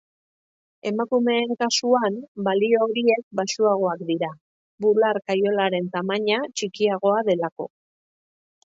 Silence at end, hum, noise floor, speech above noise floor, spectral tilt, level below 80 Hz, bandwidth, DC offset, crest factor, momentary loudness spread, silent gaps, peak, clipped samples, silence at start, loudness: 1 s; none; under -90 dBFS; over 68 dB; -4 dB/octave; -72 dBFS; 8 kHz; under 0.1%; 16 dB; 8 LU; 2.28-2.35 s, 3.23-3.31 s, 4.41-4.78 s, 7.52-7.56 s; -6 dBFS; under 0.1%; 0.85 s; -22 LUFS